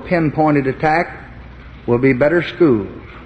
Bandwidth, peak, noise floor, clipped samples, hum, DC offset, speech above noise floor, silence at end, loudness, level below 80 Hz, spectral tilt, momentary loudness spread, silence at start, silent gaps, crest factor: 8 kHz; 0 dBFS; -36 dBFS; under 0.1%; none; under 0.1%; 20 dB; 0 s; -16 LUFS; -40 dBFS; -9 dB/octave; 14 LU; 0 s; none; 16 dB